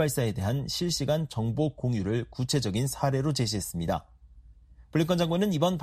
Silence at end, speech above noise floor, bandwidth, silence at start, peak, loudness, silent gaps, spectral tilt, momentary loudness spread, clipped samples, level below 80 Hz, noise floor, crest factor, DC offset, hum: 0 s; 26 dB; 14.5 kHz; 0 s; -10 dBFS; -28 LUFS; none; -5.5 dB/octave; 5 LU; under 0.1%; -50 dBFS; -53 dBFS; 18 dB; under 0.1%; none